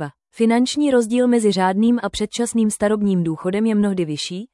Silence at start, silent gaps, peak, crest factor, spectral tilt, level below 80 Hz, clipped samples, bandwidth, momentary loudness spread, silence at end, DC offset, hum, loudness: 0 s; none; -6 dBFS; 12 dB; -5.5 dB/octave; -52 dBFS; under 0.1%; 12 kHz; 6 LU; 0.1 s; under 0.1%; none; -19 LUFS